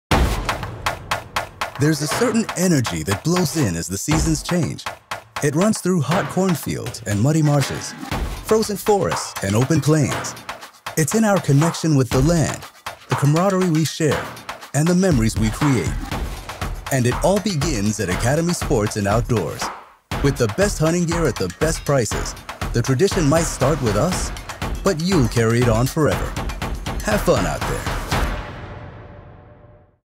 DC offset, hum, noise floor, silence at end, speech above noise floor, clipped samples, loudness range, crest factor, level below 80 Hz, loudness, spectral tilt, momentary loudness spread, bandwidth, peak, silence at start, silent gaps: under 0.1%; none; -48 dBFS; 0.6 s; 29 dB; under 0.1%; 2 LU; 14 dB; -32 dBFS; -20 LUFS; -5.5 dB/octave; 11 LU; 16 kHz; -6 dBFS; 0.1 s; none